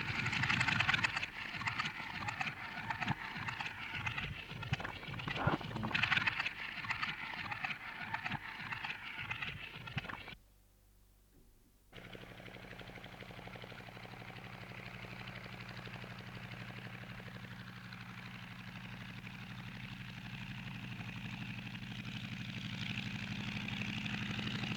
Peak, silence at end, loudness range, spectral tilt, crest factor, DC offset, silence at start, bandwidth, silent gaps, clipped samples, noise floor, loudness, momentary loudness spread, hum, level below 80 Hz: -18 dBFS; 0 s; 13 LU; -4.5 dB/octave; 26 dB; under 0.1%; 0 s; over 20 kHz; none; under 0.1%; -66 dBFS; -40 LUFS; 15 LU; none; -62 dBFS